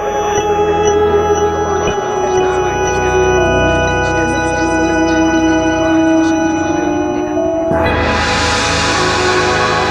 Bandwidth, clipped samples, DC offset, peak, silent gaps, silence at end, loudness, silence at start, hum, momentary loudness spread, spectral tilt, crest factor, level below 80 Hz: 12.5 kHz; under 0.1%; under 0.1%; 0 dBFS; none; 0 s; -13 LUFS; 0 s; none; 3 LU; -4.5 dB/octave; 12 dB; -30 dBFS